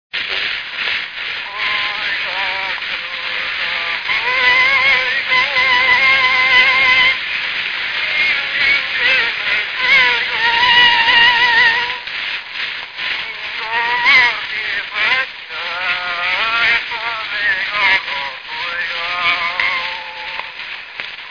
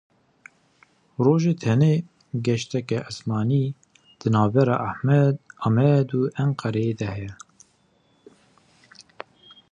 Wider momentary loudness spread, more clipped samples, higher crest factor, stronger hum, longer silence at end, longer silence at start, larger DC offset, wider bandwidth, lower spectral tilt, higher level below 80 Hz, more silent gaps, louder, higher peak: second, 13 LU vs 16 LU; neither; about the same, 16 dB vs 18 dB; neither; second, 0 s vs 2.35 s; second, 0.15 s vs 1.2 s; neither; second, 5.4 kHz vs 9.4 kHz; second, -1 dB/octave vs -8 dB/octave; first, -50 dBFS vs -58 dBFS; neither; first, -14 LUFS vs -23 LUFS; first, 0 dBFS vs -6 dBFS